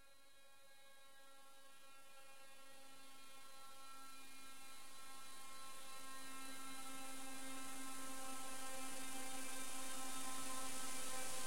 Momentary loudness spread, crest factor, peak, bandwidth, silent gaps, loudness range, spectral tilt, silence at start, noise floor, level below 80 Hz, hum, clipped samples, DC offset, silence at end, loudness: 17 LU; 18 dB; -30 dBFS; 16.5 kHz; none; 14 LU; -1 dB/octave; 0 s; -69 dBFS; -78 dBFS; none; under 0.1%; 0.4%; 0 s; -51 LUFS